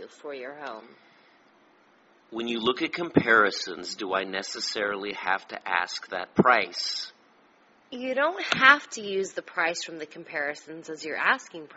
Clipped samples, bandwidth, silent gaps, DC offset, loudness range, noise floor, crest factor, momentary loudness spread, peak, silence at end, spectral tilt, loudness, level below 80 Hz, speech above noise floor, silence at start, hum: under 0.1%; 8 kHz; none; under 0.1%; 3 LU; -60 dBFS; 26 dB; 18 LU; -2 dBFS; 0 s; -1.5 dB/octave; -26 LUFS; -68 dBFS; 33 dB; 0 s; none